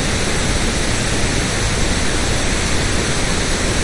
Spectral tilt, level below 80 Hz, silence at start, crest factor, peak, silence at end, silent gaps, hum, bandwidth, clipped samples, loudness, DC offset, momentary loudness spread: -3.5 dB/octave; -22 dBFS; 0 s; 12 dB; -4 dBFS; 0 s; none; none; 11.5 kHz; under 0.1%; -18 LUFS; under 0.1%; 0 LU